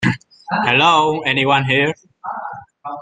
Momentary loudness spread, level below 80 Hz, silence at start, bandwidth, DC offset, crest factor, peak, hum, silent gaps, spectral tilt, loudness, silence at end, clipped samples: 19 LU; -56 dBFS; 0 s; 9.4 kHz; under 0.1%; 16 dB; 0 dBFS; none; none; -5 dB/octave; -15 LUFS; 0 s; under 0.1%